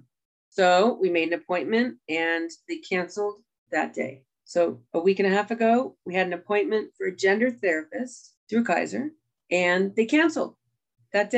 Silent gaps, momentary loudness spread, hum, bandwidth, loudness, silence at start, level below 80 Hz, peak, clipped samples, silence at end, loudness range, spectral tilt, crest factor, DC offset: 3.58-3.66 s, 8.37-8.47 s; 12 LU; none; 9.2 kHz; -25 LUFS; 0.55 s; -78 dBFS; -6 dBFS; under 0.1%; 0 s; 3 LU; -5 dB/octave; 18 dB; under 0.1%